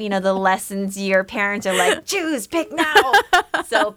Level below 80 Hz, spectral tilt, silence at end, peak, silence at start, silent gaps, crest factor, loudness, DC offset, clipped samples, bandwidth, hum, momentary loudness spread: -54 dBFS; -3 dB/octave; 0.05 s; -2 dBFS; 0 s; none; 18 dB; -18 LUFS; under 0.1%; under 0.1%; over 20 kHz; none; 8 LU